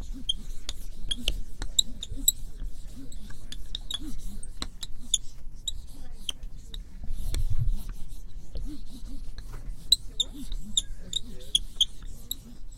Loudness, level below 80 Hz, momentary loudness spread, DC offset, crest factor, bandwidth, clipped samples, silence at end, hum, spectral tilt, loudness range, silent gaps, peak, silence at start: -30 LUFS; -34 dBFS; 20 LU; under 0.1%; 22 dB; 16 kHz; under 0.1%; 0 s; none; -1.5 dB/octave; 9 LU; none; -6 dBFS; 0 s